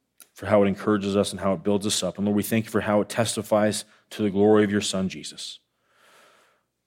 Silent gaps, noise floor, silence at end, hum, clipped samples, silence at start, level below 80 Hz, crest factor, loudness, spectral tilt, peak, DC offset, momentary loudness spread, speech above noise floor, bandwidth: none; -64 dBFS; 1.3 s; none; under 0.1%; 0.2 s; -68 dBFS; 18 dB; -24 LUFS; -5 dB/octave; -8 dBFS; under 0.1%; 13 LU; 41 dB; 16.5 kHz